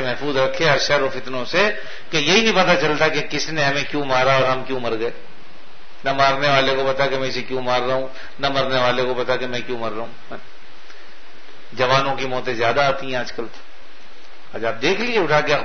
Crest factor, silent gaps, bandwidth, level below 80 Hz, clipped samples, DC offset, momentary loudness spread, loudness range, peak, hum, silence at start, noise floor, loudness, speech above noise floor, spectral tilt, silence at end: 22 dB; none; 6.6 kHz; -50 dBFS; under 0.1%; 6%; 12 LU; 6 LU; 0 dBFS; none; 0 s; -45 dBFS; -19 LUFS; 25 dB; -4 dB/octave; 0 s